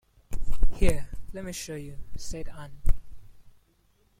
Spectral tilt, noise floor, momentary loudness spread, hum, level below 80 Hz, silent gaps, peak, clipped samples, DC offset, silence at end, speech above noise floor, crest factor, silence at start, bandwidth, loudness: -5 dB/octave; -65 dBFS; 15 LU; none; -30 dBFS; none; -6 dBFS; under 0.1%; under 0.1%; 1 s; 40 dB; 18 dB; 0.3 s; 12 kHz; -35 LUFS